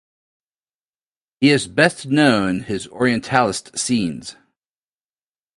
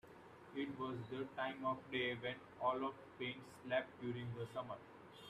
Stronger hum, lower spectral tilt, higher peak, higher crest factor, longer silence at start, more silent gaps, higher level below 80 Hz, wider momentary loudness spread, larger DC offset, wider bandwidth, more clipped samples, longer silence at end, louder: neither; second, -4.5 dB/octave vs -6.5 dB/octave; first, 0 dBFS vs -26 dBFS; about the same, 20 dB vs 20 dB; first, 1.4 s vs 0.05 s; neither; first, -54 dBFS vs -78 dBFS; about the same, 11 LU vs 11 LU; neither; second, 11.5 kHz vs 14 kHz; neither; first, 1.25 s vs 0 s; first, -18 LUFS vs -45 LUFS